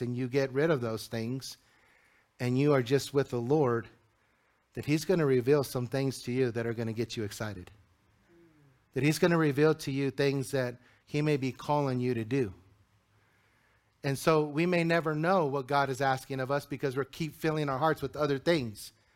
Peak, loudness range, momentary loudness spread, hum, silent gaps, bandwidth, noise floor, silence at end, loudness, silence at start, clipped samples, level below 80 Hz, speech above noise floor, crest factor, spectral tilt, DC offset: -12 dBFS; 4 LU; 10 LU; none; none; 16.5 kHz; -71 dBFS; 0.25 s; -30 LUFS; 0 s; under 0.1%; -64 dBFS; 41 dB; 20 dB; -6 dB/octave; under 0.1%